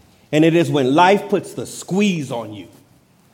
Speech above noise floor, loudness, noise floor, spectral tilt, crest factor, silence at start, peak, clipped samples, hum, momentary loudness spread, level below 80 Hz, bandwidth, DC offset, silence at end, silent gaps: 36 dB; -17 LUFS; -53 dBFS; -5.5 dB/octave; 16 dB; 0.3 s; -2 dBFS; under 0.1%; none; 16 LU; -64 dBFS; 16.5 kHz; under 0.1%; 0.7 s; none